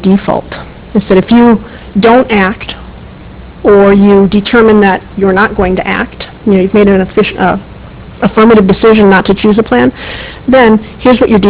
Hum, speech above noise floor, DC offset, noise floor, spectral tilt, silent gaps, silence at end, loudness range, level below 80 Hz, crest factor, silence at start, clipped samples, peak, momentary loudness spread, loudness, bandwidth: none; 22 dB; under 0.1%; -28 dBFS; -11 dB/octave; none; 0 s; 3 LU; -30 dBFS; 8 dB; 0 s; 3%; 0 dBFS; 12 LU; -7 LUFS; 4 kHz